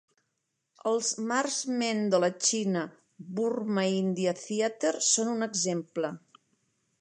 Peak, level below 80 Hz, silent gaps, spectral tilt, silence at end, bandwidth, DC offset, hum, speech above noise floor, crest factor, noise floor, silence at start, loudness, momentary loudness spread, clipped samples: -12 dBFS; -82 dBFS; none; -3.5 dB/octave; 0.8 s; 11 kHz; under 0.1%; none; 52 dB; 18 dB; -81 dBFS; 0.85 s; -29 LUFS; 9 LU; under 0.1%